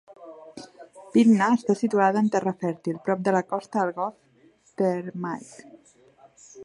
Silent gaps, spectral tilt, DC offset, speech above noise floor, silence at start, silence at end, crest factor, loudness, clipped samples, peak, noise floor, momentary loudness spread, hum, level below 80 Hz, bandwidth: none; -7 dB/octave; under 0.1%; 36 dB; 0.1 s; 0 s; 18 dB; -24 LUFS; under 0.1%; -6 dBFS; -59 dBFS; 24 LU; none; -74 dBFS; 10.5 kHz